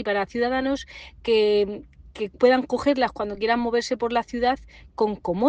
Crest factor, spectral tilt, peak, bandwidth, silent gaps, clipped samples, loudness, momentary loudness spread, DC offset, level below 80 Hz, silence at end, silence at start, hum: 18 dB; -5 dB/octave; -6 dBFS; 9 kHz; none; under 0.1%; -24 LUFS; 13 LU; under 0.1%; -50 dBFS; 0 s; 0 s; none